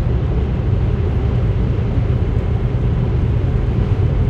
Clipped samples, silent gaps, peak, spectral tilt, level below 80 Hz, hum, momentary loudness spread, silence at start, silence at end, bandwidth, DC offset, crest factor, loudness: under 0.1%; none; -4 dBFS; -10 dB/octave; -20 dBFS; none; 1 LU; 0 s; 0 s; 5.4 kHz; under 0.1%; 12 dB; -18 LUFS